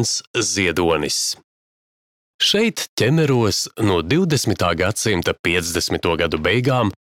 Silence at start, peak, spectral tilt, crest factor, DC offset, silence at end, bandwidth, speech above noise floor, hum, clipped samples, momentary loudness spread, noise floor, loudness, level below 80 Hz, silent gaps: 0 s; -4 dBFS; -4 dB/octave; 16 dB; under 0.1%; 0.1 s; 17 kHz; over 71 dB; none; under 0.1%; 4 LU; under -90 dBFS; -18 LUFS; -44 dBFS; 0.27-0.34 s, 1.44-2.39 s, 2.88-2.97 s, 5.39-5.44 s